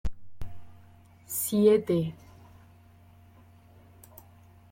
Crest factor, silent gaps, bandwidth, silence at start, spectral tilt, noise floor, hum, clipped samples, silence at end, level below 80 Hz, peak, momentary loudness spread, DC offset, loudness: 20 dB; none; 16.5 kHz; 0.05 s; -6 dB/octave; -55 dBFS; none; under 0.1%; 2.55 s; -48 dBFS; -10 dBFS; 29 LU; under 0.1%; -26 LUFS